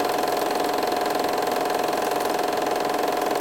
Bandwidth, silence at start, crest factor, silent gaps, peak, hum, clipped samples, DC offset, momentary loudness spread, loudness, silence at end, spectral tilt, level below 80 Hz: 17 kHz; 0 s; 14 dB; none; -10 dBFS; none; under 0.1%; 0.1%; 0 LU; -24 LUFS; 0 s; -3 dB/octave; -60 dBFS